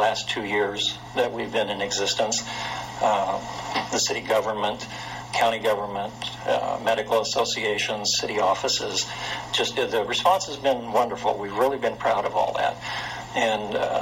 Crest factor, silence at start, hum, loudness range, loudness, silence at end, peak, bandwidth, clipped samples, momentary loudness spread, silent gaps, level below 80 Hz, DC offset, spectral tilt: 20 dB; 0 s; none; 2 LU; -25 LUFS; 0 s; -6 dBFS; 16.5 kHz; under 0.1%; 8 LU; none; -56 dBFS; under 0.1%; -2.5 dB/octave